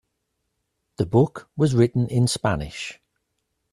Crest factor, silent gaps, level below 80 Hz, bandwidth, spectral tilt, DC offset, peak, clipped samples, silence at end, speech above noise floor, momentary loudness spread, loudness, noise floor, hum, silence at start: 20 dB; none; -48 dBFS; 12.5 kHz; -6.5 dB/octave; under 0.1%; -4 dBFS; under 0.1%; 0.8 s; 55 dB; 12 LU; -22 LUFS; -76 dBFS; none; 1 s